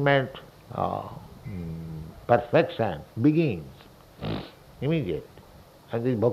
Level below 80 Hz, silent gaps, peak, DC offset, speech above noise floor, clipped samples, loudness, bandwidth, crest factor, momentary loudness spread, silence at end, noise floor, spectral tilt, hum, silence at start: -52 dBFS; none; -6 dBFS; under 0.1%; 25 dB; under 0.1%; -27 LUFS; 14.5 kHz; 22 dB; 17 LU; 0 s; -51 dBFS; -8 dB/octave; none; 0 s